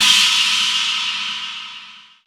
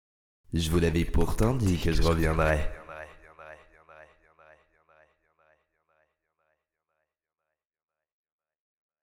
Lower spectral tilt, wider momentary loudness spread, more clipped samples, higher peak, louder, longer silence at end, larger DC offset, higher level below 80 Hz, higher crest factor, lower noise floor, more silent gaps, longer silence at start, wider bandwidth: second, 3 dB/octave vs -6 dB/octave; second, 19 LU vs 22 LU; neither; first, -2 dBFS vs -10 dBFS; first, -15 LUFS vs -27 LUFS; second, 0.25 s vs 5 s; neither; second, -62 dBFS vs -36 dBFS; about the same, 18 dB vs 20 dB; second, -40 dBFS vs under -90 dBFS; neither; second, 0 s vs 0.5 s; first, over 20 kHz vs 17.5 kHz